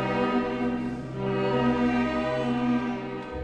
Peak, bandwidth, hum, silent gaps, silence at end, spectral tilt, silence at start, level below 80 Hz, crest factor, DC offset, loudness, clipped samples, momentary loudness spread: -12 dBFS; 8.6 kHz; none; none; 0 s; -7.5 dB/octave; 0 s; -48 dBFS; 14 dB; under 0.1%; -27 LUFS; under 0.1%; 8 LU